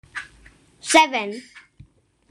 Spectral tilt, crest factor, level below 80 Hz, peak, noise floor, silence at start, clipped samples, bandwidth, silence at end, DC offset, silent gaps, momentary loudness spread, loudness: -1.5 dB/octave; 22 dB; -58 dBFS; -2 dBFS; -52 dBFS; 0.15 s; under 0.1%; 13 kHz; 0.7 s; under 0.1%; none; 20 LU; -18 LUFS